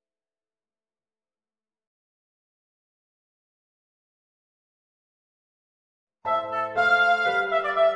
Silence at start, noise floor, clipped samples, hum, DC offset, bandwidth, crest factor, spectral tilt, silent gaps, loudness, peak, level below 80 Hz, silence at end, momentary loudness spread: 6.25 s; under -90 dBFS; under 0.1%; none; under 0.1%; 9.6 kHz; 20 dB; -3.5 dB/octave; none; -22 LUFS; -8 dBFS; -72 dBFS; 0 s; 8 LU